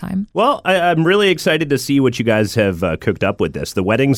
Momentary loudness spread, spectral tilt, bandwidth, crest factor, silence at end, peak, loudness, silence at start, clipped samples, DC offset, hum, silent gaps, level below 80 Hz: 6 LU; -5.5 dB/octave; 17.5 kHz; 12 dB; 0 s; -4 dBFS; -16 LUFS; 0 s; under 0.1%; under 0.1%; none; none; -44 dBFS